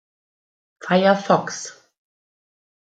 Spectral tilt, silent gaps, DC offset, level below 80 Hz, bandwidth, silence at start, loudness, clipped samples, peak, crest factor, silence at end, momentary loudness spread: -5 dB/octave; none; under 0.1%; -70 dBFS; 9 kHz; 0.8 s; -19 LUFS; under 0.1%; -2 dBFS; 20 dB; 1.15 s; 18 LU